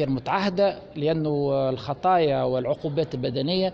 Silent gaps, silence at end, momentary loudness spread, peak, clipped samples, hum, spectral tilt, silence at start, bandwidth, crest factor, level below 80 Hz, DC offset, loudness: none; 0 s; 6 LU; -10 dBFS; under 0.1%; none; -8 dB/octave; 0 s; 7.2 kHz; 14 dB; -54 dBFS; under 0.1%; -24 LUFS